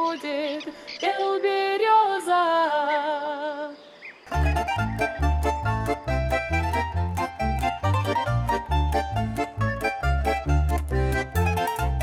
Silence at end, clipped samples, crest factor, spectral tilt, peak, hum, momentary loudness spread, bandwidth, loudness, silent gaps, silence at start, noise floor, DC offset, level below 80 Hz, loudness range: 0 s; under 0.1%; 14 dB; -6 dB/octave; -10 dBFS; none; 8 LU; 16 kHz; -25 LUFS; none; 0 s; -45 dBFS; under 0.1%; -30 dBFS; 3 LU